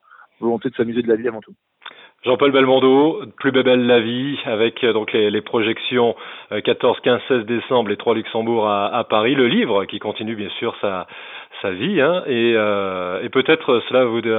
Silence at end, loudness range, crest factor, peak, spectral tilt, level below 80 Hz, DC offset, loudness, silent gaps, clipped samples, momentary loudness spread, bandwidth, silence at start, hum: 0 s; 4 LU; 16 dB; -2 dBFS; -10 dB/octave; -66 dBFS; under 0.1%; -18 LUFS; none; under 0.1%; 11 LU; 4.1 kHz; 0.4 s; none